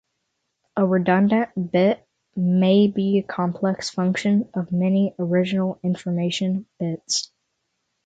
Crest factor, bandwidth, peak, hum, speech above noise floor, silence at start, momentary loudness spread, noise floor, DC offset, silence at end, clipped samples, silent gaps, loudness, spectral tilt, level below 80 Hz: 14 dB; 9 kHz; -6 dBFS; none; 55 dB; 0.75 s; 8 LU; -76 dBFS; under 0.1%; 0.8 s; under 0.1%; none; -22 LUFS; -6 dB/octave; -64 dBFS